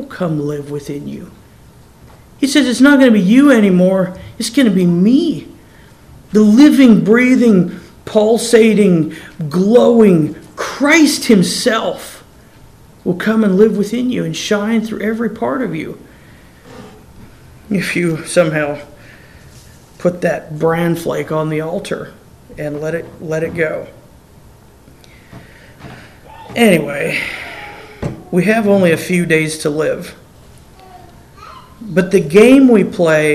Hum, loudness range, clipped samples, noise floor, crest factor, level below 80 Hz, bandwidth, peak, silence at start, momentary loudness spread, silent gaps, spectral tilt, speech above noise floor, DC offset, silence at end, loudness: none; 10 LU; 0.3%; -42 dBFS; 14 dB; -46 dBFS; 15.5 kHz; 0 dBFS; 0 s; 17 LU; none; -5.5 dB/octave; 30 dB; 0.1%; 0 s; -13 LUFS